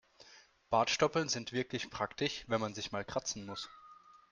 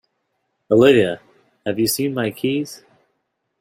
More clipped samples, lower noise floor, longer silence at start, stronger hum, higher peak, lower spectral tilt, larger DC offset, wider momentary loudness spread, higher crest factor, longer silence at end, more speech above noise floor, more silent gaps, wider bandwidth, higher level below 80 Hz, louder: neither; second, -62 dBFS vs -72 dBFS; second, 0.2 s vs 0.7 s; neither; second, -16 dBFS vs -2 dBFS; second, -3.5 dB/octave vs -5 dB/octave; neither; second, 10 LU vs 17 LU; about the same, 22 dB vs 18 dB; second, 0.2 s vs 0.85 s; second, 26 dB vs 55 dB; neither; second, 10.5 kHz vs 16 kHz; second, -66 dBFS vs -58 dBFS; second, -36 LUFS vs -18 LUFS